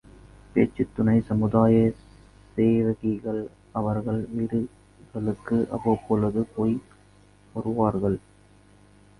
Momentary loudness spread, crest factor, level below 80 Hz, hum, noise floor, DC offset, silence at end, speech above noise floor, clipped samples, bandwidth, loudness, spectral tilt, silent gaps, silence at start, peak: 12 LU; 20 dB; -50 dBFS; 50 Hz at -45 dBFS; -55 dBFS; under 0.1%; 1 s; 31 dB; under 0.1%; 10.5 kHz; -25 LUFS; -10 dB/octave; none; 0.55 s; -6 dBFS